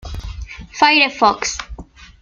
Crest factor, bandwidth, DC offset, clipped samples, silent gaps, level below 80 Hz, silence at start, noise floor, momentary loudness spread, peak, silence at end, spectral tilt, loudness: 18 dB; 9.6 kHz; under 0.1%; under 0.1%; none; -34 dBFS; 0.05 s; -36 dBFS; 21 LU; 0 dBFS; 0.15 s; -2.5 dB/octave; -14 LUFS